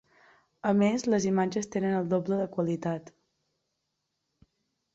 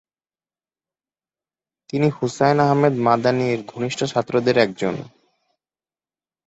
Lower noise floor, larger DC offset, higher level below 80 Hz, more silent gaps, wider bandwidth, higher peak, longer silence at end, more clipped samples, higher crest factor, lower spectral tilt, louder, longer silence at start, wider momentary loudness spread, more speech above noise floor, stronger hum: second, -81 dBFS vs under -90 dBFS; neither; second, -68 dBFS vs -62 dBFS; neither; about the same, 8 kHz vs 8.2 kHz; second, -14 dBFS vs -2 dBFS; first, 1.85 s vs 1.45 s; neither; about the same, 16 dB vs 20 dB; about the same, -6.5 dB/octave vs -6 dB/octave; second, -28 LUFS vs -20 LUFS; second, 0.65 s vs 1.95 s; about the same, 8 LU vs 9 LU; second, 54 dB vs over 71 dB; neither